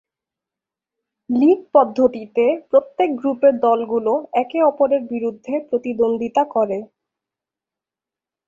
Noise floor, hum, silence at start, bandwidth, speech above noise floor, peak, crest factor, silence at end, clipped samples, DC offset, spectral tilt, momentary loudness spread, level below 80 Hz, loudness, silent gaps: -89 dBFS; none; 1.3 s; 7.2 kHz; 71 dB; -2 dBFS; 18 dB; 1.65 s; under 0.1%; under 0.1%; -7.5 dB/octave; 8 LU; -64 dBFS; -18 LUFS; none